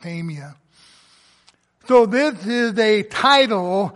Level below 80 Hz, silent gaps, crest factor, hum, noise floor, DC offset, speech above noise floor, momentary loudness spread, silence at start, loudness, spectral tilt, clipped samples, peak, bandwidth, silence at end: -64 dBFS; none; 16 dB; none; -57 dBFS; under 0.1%; 40 dB; 15 LU; 0.05 s; -17 LUFS; -5 dB/octave; under 0.1%; -2 dBFS; 11.5 kHz; 0.05 s